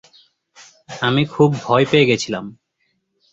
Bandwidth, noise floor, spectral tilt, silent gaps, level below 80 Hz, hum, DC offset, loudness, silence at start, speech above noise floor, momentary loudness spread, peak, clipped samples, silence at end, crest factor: 8 kHz; -69 dBFS; -5.5 dB/octave; none; -54 dBFS; none; under 0.1%; -17 LUFS; 0.9 s; 52 dB; 15 LU; -2 dBFS; under 0.1%; 0.8 s; 18 dB